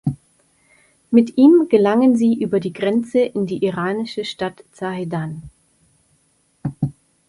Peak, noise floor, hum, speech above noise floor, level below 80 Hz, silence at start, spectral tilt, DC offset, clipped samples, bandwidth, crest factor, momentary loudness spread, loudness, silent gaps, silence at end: -2 dBFS; -62 dBFS; none; 45 dB; -54 dBFS; 0.05 s; -7.5 dB/octave; under 0.1%; under 0.1%; 11.5 kHz; 18 dB; 17 LU; -18 LUFS; none; 0.4 s